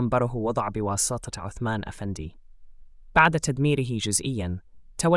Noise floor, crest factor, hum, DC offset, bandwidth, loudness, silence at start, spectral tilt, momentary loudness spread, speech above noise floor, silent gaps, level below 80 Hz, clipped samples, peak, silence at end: -45 dBFS; 20 dB; none; under 0.1%; 12 kHz; -25 LUFS; 0 s; -4.5 dB/octave; 15 LU; 20 dB; none; -46 dBFS; under 0.1%; -6 dBFS; 0 s